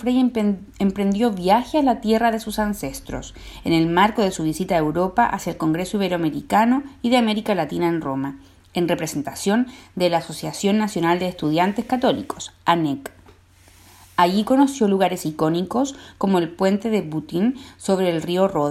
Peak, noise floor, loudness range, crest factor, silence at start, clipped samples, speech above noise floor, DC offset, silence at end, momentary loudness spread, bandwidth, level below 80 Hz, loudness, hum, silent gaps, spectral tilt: -4 dBFS; -51 dBFS; 2 LU; 16 dB; 0 s; under 0.1%; 30 dB; under 0.1%; 0 s; 9 LU; 16 kHz; -48 dBFS; -21 LUFS; none; none; -5.5 dB/octave